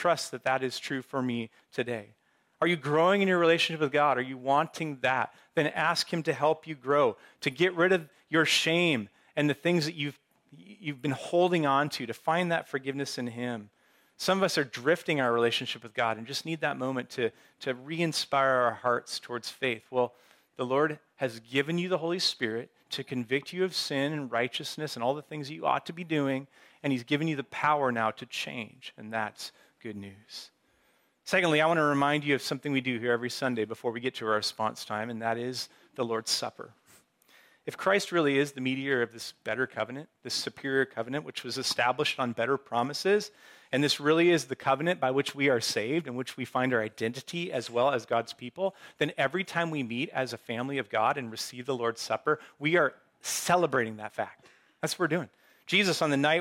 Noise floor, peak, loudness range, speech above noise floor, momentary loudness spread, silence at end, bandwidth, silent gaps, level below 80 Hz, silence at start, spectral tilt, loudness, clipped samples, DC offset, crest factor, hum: -69 dBFS; -12 dBFS; 5 LU; 40 dB; 11 LU; 0 s; 16.5 kHz; none; -78 dBFS; 0 s; -4.5 dB/octave; -29 LUFS; under 0.1%; under 0.1%; 18 dB; none